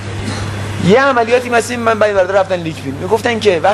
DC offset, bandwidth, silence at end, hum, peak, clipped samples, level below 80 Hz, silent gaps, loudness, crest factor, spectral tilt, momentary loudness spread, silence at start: 0.2%; 13.5 kHz; 0 s; none; 0 dBFS; under 0.1%; -40 dBFS; none; -14 LUFS; 14 dB; -5 dB/octave; 11 LU; 0 s